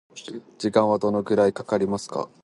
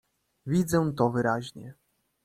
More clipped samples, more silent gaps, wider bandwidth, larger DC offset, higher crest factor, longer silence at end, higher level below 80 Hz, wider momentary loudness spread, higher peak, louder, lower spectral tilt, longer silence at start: neither; neither; second, 11.5 kHz vs 15 kHz; neither; about the same, 18 dB vs 20 dB; second, 0.2 s vs 0.55 s; about the same, -60 dBFS vs -58 dBFS; second, 17 LU vs 20 LU; first, -6 dBFS vs -10 dBFS; first, -23 LUFS vs -27 LUFS; about the same, -6 dB/octave vs -6.5 dB/octave; second, 0.15 s vs 0.45 s